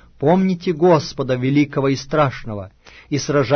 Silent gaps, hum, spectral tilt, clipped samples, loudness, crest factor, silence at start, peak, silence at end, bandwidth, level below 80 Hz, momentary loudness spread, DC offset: none; none; -6.5 dB/octave; under 0.1%; -18 LUFS; 16 dB; 0.2 s; -2 dBFS; 0 s; 6.6 kHz; -46 dBFS; 14 LU; under 0.1%